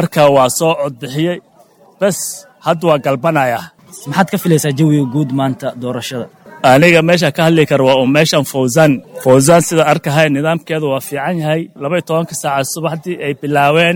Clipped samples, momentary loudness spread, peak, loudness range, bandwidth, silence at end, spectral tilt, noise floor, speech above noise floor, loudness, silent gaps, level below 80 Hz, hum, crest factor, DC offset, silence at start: under 0.1%; 11 LU; 0 dBFS; 6 LU; 19.5 kHz; 0 s; -5 dB/octave; -46 dBFS; 34 dB; -13 LUFS; none; -52 dBFS; none; 12 dB; under 0.1%; 0 s